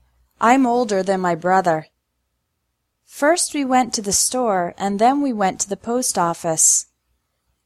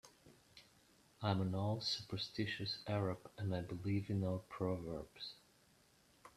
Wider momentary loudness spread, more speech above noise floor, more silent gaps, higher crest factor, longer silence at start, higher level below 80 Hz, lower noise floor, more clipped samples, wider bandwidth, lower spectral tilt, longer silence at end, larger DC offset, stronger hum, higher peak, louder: second, 7 LU vs 14 LU; first, 55 dB vs 30 dB; neither; about the same, 20 dB vs 22 dB; first, 0.4 s vs 0.05 s; first, -58 dBFS vs -70 dBFS; about the same, -74 dBFS vs -71 dBFS; neither; first, 15 kHz vs 13.5 kHz; second, -3 dB/octave vs -6 dB/octave; first, 0.8 s vs 0.05 s; neither; neither; first, 0 dBFS vs -20 dBFS; first, -18 LUFS vs -42 LUFS